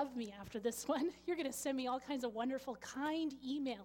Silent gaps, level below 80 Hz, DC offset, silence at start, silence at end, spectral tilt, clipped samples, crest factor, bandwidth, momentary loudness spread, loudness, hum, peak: none; -72 dBFS; under 0.1%; 0 s; 0 s; -3.5 dB/octave; under 0.1%; 16 dB; 17.5 kHz; 5 LU; -41 LUFS; none; -24 dBFS